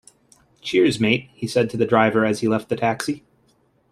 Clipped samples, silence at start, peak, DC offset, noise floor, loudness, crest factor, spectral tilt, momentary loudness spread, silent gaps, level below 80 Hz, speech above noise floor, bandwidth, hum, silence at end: under 0.1%; 0.65 s; -2 dBFS; under 0.1%; -62 dBFS; -20 LUFS; 18 dB; -5.5 dB/octave; 10 LU; none; -58 dBFS; 42 dB; 13.5 kHz; none; 0.75 s